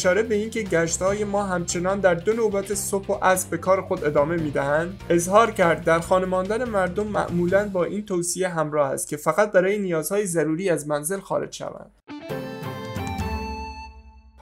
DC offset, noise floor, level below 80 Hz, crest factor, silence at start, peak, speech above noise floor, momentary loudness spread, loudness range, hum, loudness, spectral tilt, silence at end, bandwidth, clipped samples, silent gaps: under 0.1%; -47 dBFS; -46 dBFS; 20 dB; 0 s; -4 dBFS; 25 dB; 13 LU; 6 LU; none; -23 LUFS; -4.5 dB/octave; 0 s; 16 kHz; under 0.1%; none